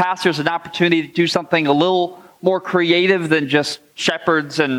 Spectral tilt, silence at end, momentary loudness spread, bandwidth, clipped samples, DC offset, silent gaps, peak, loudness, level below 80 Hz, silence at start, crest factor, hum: -5 dB/octave; 0 s; 6 LU; 13.5 kHz; under 0.1%; under 0.1%; none; -2 dBFS; -17 LUFS; -64 dBFS; 0 s; 16 dB; none